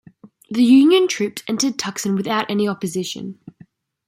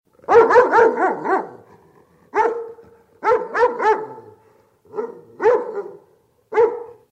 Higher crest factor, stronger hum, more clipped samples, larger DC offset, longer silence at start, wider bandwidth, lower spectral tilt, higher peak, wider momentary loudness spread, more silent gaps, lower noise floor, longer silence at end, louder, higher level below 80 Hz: about the same, 16 dB vs 18 dB; neither; neither; neither; first, 0.5 s vs 0.3 s; first, 16 kHz vs 8 kHz; about the same, -4.5 dB/octave vs -5.5 dB/octave; about the same, -4 dBFS vs -2 dBFS; second, 15 LU vs 21 LU; neither; second, -50 dBFS vs -57 dBFS; first, 0.75 s vs 0.2 s; about the same, -18 LUFS vs -17 LUFS; about the same, -66 dBFS vs -62 dBFS